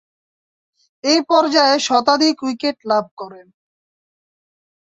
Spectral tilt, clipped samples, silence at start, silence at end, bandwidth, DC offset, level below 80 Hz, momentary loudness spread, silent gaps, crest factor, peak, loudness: -2 dB/octave; under 0.1%; 1.05 s; 1.55 s; 8 kHz; under 0.1%; -68 dBFS; 15 LU; 3.11-3.17 s; 18 dB; -2 dBFS; -16 LUFS